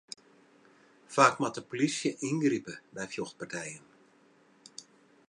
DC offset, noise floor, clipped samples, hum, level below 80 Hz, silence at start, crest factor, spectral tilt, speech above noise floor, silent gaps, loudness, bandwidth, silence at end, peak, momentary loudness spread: under 0.1%; -63 dBFS; under 0.1%; none; -80 dBFS; 1.1 s; 28 dB; -4 dB/octave; 33 dB; none; -31 LUFS; 11 kHz; 0.45 s; -6 dBFS; 24 LU